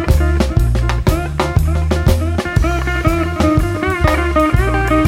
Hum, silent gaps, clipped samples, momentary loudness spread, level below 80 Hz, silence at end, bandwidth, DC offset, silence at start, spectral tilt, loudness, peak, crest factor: none; none; under 0.1%; 3 LU; -18 dBFS; 0 s; 16 kHz; 0.2%; 0 s; -6.5 dB/octave; -15 LUFS; 0 dBFS; 14 dB